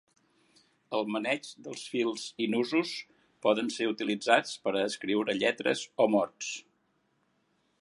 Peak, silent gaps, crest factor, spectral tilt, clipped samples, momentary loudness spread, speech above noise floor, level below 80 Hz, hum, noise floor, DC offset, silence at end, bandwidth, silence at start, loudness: -8 dBFS; none; 24 dB; -3.5 dB/octave; under 0.1%; 10 LU; 44 dB; -80 dBFS; none; -73 dBFS; under 0.1%; 1.2 s; 11.5 kHz; 0.9 s; -30 LUFS